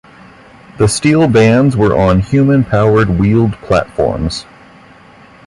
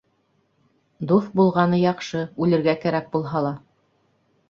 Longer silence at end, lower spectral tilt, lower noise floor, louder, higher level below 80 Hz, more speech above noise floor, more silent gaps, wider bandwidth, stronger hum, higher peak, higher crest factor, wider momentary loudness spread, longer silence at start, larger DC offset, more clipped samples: first, 1.05 s vs 0.9 s; about the same, -6.5 dB/octave vs -7.5 dB/octave; second, -40 dBFS vs -67 dBFS; first, -11 LUFS vs -22 LUFS; first, -30 dBFS vs -62 dBFS; second, 30 dB vs 46 dB; neither; first, 11.5 kHz vs 7.2 kHz; neither; first, 0 dBFS vs -4 dBFS; second, 12 dB vs 18 dB; second, 7 LU vs 10 LU; second, 0.75 s vs 1 s; neither; neither